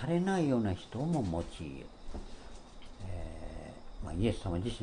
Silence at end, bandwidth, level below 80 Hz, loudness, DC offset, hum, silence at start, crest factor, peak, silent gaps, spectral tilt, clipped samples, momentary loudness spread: 0 s; 10.5 kHz; -46 dBFS; -35 LUFS; under 0.1%; none; 0 s; 18 dB; -16 dBFS; none; -7 dB/octave; under 0.1%; 20 LU